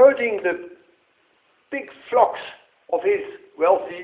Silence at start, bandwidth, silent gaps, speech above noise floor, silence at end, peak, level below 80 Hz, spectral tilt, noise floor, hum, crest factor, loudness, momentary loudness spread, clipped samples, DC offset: 0 s; 4 kHz; none; 41 dB; 0 s; -2 dBFS; -68 dBFS; -7.5 dB/octave; -63 dBFS; none; 20 dB; -22 LUFS; 16 LU; under 0.1%; under 0.1%